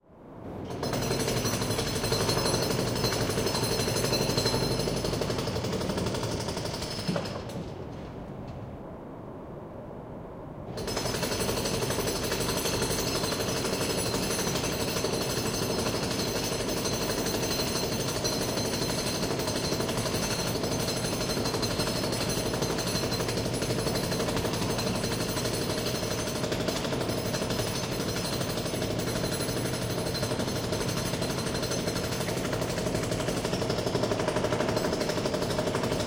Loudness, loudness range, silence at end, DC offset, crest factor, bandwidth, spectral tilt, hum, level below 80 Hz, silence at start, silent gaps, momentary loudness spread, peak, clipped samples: -29 LUFS; 5 LU; 0 s; under 0.1%; 18 dB; 16.5 kHz; -4 dB/octave; none; -46 dBFS; 0.1 s; none; 10 LU; -12 dBFS; under 0.1%